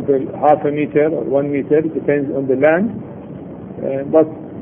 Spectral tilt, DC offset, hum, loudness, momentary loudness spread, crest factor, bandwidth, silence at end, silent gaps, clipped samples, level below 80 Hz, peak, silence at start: -11 dB/octave; under 0.1%; none; -16 LUFS; 17 LU; 16 dB; 3.6 kHz; 0 s; none; under 0.1%; -54 dBFS; 0 dBFS; 0 s